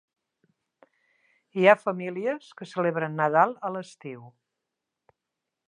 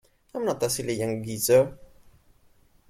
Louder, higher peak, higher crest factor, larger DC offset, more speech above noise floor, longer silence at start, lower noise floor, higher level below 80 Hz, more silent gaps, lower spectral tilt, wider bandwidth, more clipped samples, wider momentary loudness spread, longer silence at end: about the same, -25 LUFS vs -25 LUFS; first, -4 dBFS vs -8 dBFS; about the same, 24 dB vs 20 dB; neither; first, 60 dB vs 35 dB; first, 1.55 s vs 0.35 s; first, -85 dBFS vs -60 dBFS; second, -84 dBFS vs -58 dBFS; neither; first, -6.5 dB/octave vs -4.5 dB/octave; second, 10.5 kHz vs 16.5 kHz; neither; first, 21 LU vs 10 LU; first, 1.4 s vs 1.05 s